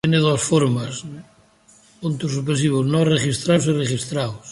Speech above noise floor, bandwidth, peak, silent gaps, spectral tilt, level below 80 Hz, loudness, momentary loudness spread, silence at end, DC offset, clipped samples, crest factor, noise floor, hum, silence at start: 34 dB; 11.5 kHz; -4 dBFS; none; -5.5 dB/octave; -52 dBFS; -20 LUFS; 12 LU; 0 s; under 0.1%; under 0.1%; 16 dB; -53 dBFS; none; 0.05 s